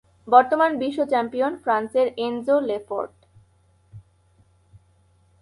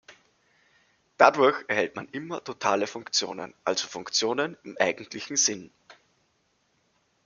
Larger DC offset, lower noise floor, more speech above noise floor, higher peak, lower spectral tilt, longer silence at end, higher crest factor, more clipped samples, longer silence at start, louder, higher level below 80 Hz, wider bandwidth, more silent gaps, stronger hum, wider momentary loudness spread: neither; second, -60 dBFS vs -71 dBFS; second, 39 dB vs 44 dB; about the same, -2 dBFS vs -2 dBFS; first, -6 dB/octave vs -1.5 dB/octave; about the same, 1.4 s vs 1.35 s; about the same, 22 dB vs 26 dB; neither; first, 0.25 s vs 0.1 s; first, -22 LUFS vs -26 LUFS; first, -64 dBFS vs -76 dBFS; about the same, 11.5 kHz vs 10.5 kHz; neither; neither; second, 11 LU vs 15 LU